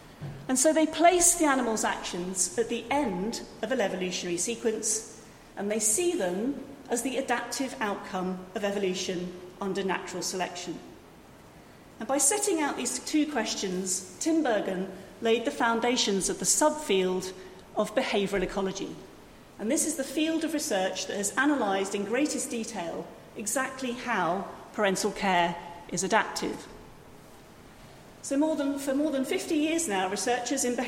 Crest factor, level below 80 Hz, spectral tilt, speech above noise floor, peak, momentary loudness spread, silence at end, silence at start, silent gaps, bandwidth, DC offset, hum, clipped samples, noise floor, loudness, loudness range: 20 dB; -58 dBFS; -3 dB/octave; 23 dB; -8 dBFS; 12 LU; 0 s; 0 s; none; 16.5 kHz; under 0.1%; none; under 0.1%; -51 dBFS; -28 LUFS; 5 LU